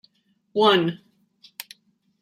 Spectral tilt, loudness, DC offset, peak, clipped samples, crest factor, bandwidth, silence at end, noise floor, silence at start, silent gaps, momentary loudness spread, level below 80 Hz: -5 dB/octave; -21 LUFS; under 0.1%; -4 dBFS; under 0.1%; 20 dB; 16 kHz; 1.25 s; -62 dBFS; 0.55 s; none; 24 LU; -74 dBFS